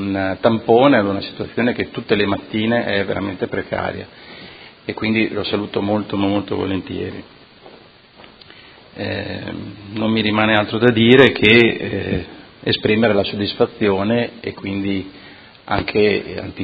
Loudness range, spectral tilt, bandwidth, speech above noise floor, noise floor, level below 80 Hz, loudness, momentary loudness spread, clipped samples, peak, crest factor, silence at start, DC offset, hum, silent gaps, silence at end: 11 LU; -8 dB/octave; 8 kHz; 28 dB; -45 dBFS; -44 dBFS; -17 LUFS; 17 LU; under 0.1%; 0 dBFS; 18 dB; 0 s; under 0.1%; none; none; 0 s